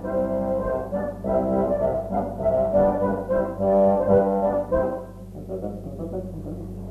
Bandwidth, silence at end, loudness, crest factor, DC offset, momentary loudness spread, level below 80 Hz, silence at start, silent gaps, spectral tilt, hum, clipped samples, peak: 13.5 kHz; 0 s; -23 LUFS; 16 dB; under 0.1%; 15 LU; -40 dBFS; 0 s; none; -10 dB/octave; none; under 0.1%; -6 dBFS